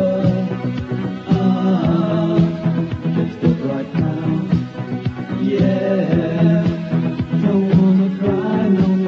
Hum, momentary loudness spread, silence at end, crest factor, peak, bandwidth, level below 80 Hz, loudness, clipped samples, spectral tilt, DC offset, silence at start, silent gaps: none; 8 LU; 0 s; 14 dB; -2 dBFS; 6.4 kHz; -44 dBFS; -18 LUFS; under 0.1%; -9.5 dB/octave; under 0.1%; 0 s; none